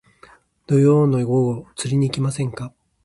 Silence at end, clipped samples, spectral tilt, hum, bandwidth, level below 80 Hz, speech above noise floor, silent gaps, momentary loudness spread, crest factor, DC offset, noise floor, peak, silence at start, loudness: 0.35 s; under 0.1%; -7 dB/octave; none; 11.5 kHz; -54 dBFS; 32 dB; none; 12 LU; 16 dB; under 0.1%; -51 dBFS; -4 dBFS; 0.7 s; -19 LUFS